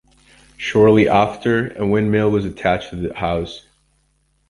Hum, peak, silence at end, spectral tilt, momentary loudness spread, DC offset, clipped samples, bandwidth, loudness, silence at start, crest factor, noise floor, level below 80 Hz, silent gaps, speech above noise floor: none; 0 dBFS; 0.9 s; -7 dB/octave; 14 LU; under 0.1%; under 0.1%; 11 kHz; -17 LUFS; 0.6 s; 18 dB; -63 dBFS; -42 dBFS; none; 46 dB